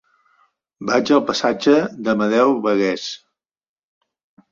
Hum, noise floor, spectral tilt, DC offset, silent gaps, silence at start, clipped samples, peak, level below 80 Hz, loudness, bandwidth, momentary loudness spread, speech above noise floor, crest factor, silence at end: none; -62 dBFS; -5 dB/octave; under 0.1%; none; 0.8 s; under 0.1%; -2 dBFS; -62 dBFS; -18 LUFS; 7.6 kHz; 12 LU; 44 dB; 18 dB; 1.35 s